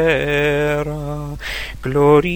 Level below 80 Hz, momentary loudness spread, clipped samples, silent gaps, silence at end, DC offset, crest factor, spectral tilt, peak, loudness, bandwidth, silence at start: -34 dBFS; 13 LU; under 0.1%; none; 0 s; 0.3%; 16 dB; -6.5 dB/octave; 0 dBFS; -18 LUFS; over 20 kHz; 0 s